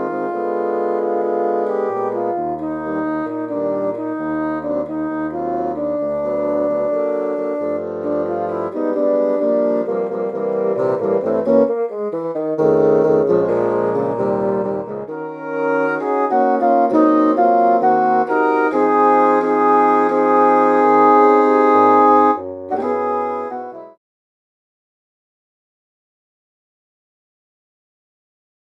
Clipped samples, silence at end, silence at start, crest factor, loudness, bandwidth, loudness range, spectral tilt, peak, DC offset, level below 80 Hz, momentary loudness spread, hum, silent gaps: under 0.1%; 4.75 s; 0 s; 16 dB; -17 LUFS; 7.4 kHz; 9 LU; -8.5 dB/octave; 0 dBFS; under 0.1%; -58 dBFS; 10 LU; none; none